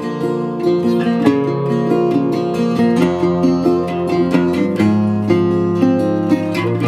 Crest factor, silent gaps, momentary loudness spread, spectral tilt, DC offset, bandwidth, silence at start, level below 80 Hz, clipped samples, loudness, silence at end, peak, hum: 14 dB; none; 3 LU; -8 dB/octave; under 0.1%; 13 kHz; 0 s; -52 dBFS; under 0.1%; -16 LUFS; 0 s; 0 dBFS; none